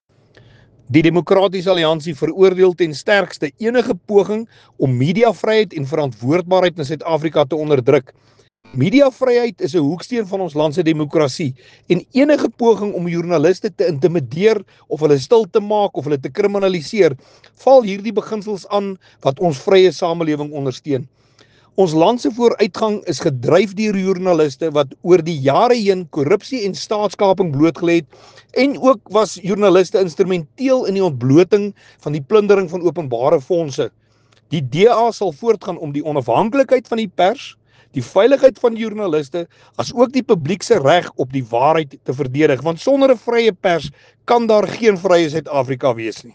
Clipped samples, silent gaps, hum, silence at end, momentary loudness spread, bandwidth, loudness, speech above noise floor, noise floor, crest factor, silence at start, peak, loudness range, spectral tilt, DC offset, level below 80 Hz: under 0.1%; none; none; 0.05 s; 9 LU; 9.4 kHz; -16 LUFS; 36 dB; -51 dBFS; 16 dB; 0.9 s; 0 dBFS; 2 LU; -6.5 dB/octave; under 0.1%; -58 dBFS